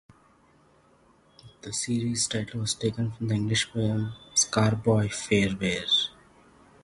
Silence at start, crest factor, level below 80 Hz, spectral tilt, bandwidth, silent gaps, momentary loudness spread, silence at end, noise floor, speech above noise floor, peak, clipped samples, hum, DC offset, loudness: 1.45 s; 20 dB; -54 dBFS; -4 dB/octave; 11.5 kHz; none; 8 LU; 0.75 s; -61 dBFS; 34 dB; -8 dBFS; under 0.1%; none; under 0.1%; -26 LUFS